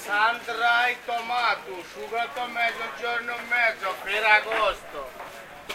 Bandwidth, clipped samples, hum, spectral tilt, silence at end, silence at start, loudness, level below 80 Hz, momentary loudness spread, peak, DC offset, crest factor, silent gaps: 16 kHz; under 0.1%; none; -1.5 dB/octave; 0 s; 0 s; -24 LUFS; -58 dBFS; 18 LU; -6 dBFS; under 0.1%; 20 dB; none